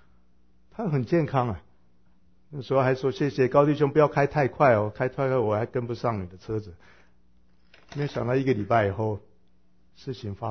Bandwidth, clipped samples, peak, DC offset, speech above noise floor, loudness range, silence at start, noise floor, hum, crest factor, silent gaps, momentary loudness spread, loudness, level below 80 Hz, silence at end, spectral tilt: 6.6 kHz; under 0.1%; -6 dBFS; 0.2%; 40 dB; 7 LU; 0.8 s; -65 dBFS; none; 20 dB; none; 16 LU; -25 LUFS; -54 dBFS; 0 s; -8.5 dB/octave